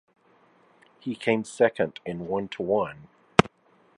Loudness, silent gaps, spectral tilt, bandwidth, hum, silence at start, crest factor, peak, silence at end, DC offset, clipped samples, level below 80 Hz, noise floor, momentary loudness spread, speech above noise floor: -26 LUFS; none; -5.5 dB/octave; 11.5 kHz; none; 1.05 s; 28 dB; 0 dBFS; 0.5 s; under 0.1%; under 0.1%; -54 dBFS; -62 dBFS; 13 LU; 35 dB